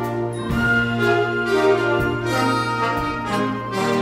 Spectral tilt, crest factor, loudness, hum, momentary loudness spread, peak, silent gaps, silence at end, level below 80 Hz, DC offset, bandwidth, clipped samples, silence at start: -6 dB/octave; 14 dB; -20 LUFS; none; 6 LU; -6 dBFS; none; 0 s; -40 dBFS; under 0.1%; 16 kHz; under 0.1%; 0 s